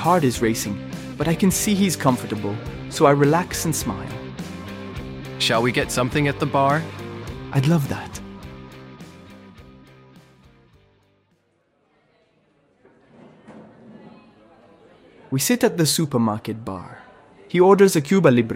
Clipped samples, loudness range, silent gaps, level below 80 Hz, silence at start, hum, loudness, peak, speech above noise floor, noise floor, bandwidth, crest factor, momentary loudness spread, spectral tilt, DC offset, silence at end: under 0.1%; 8 LU; none; -46 dBFS; 0 s; none; -20 LUFS; -2 dBFS; 46 dB; -65 dBFS; 16.5 kHz; 20 dB; 19 LU; -5 dB/octave; under 0.1%; 0 s